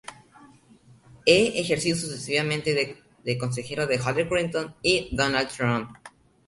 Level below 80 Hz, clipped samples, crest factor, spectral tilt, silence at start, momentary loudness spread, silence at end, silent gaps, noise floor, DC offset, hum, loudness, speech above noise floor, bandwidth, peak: -52 dBFS; under 0.1%; 24 dB; -4 dB/octave; 0.1 s; 10 LU; 0.4 s; none; -55 dBFS; under 0.1%; none; -25 LUFS; 30 dB; 11.5 kHz; -4 dBFS